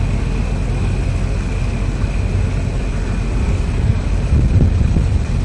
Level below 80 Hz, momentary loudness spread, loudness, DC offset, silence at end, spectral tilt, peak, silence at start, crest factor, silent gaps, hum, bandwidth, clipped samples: -18 dBFS; 6 LU; -18 LUFS; under 0.1%; 0 s; -7.5 dB/octave; -2 dBFS; 0 s; 12 dB; none; none; 10.5 kHz; under 0.1%